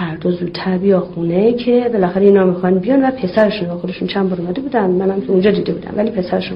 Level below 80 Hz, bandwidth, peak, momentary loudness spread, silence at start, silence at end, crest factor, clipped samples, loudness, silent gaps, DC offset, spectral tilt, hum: -46 dBFS; 5.6 kHz; 0 dBFS; 7 LU; 0 s; 0 s; 14 dB; under 0.1%; -15 LUFS; none; under 0.1%; -10 dB/octave; none